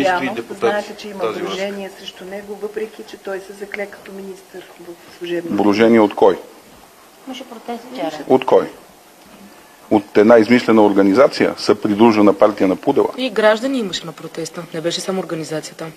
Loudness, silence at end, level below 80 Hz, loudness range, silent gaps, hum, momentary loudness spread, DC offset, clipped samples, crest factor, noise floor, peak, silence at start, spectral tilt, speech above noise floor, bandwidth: -16 LUFS; 0.05 s; -58 dBFS; 14 LU; none; none; 20 LU; under 0.1%; under 0.1%; 18 dB; -44 dBFS; 0 dBFS; 0 s; -5.5 dB/octave; 28 dB; 15 kHz